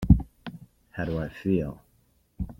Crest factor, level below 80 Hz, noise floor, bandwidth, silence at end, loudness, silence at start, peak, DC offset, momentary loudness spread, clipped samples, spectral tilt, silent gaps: 24 dB; -34 dBFS; -65 dBFS; 6 kHz; 0.05 s; -28 LUFS; 0 s; -4 dBFS; under 0.1%; 22 LU; under 0.1%; -9.5 dB/octave; none